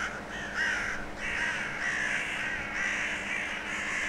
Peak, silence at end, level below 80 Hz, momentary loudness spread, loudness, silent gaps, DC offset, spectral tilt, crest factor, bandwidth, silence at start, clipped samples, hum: -18 dBFS; 0 s; -52 dBFS; 5 LU; -31 LUFS; none; under 0.1%; -2 dB/octave; 14 dB; 16.5 kHz; 0 s; under 0.1%; none